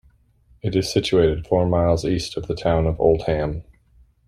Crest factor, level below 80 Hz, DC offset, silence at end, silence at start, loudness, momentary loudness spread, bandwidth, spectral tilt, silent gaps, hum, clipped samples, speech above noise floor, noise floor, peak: 18 dB; -38 dBFS; under 0.1%; 0.65 s; 0.65 s; -21 LUFS; 8 LU; 14.5 kHz; -6.5 dB/octave; none; none; under 0.1%; 37 dB; -56 dBFS; -4 dBFS